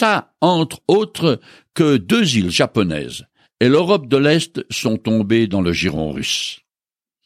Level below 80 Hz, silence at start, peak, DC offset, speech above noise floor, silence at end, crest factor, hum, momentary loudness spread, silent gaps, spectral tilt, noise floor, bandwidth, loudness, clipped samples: -48 dBFS; 0 s; -2 dBFS; under 0.1%; over 73 dB; 0.7 s; 16 dB; none; 10 LU; none; -5 dB/octave; under -90 dBFS; 15.5 kHz; -17 LUFS; under 0.1%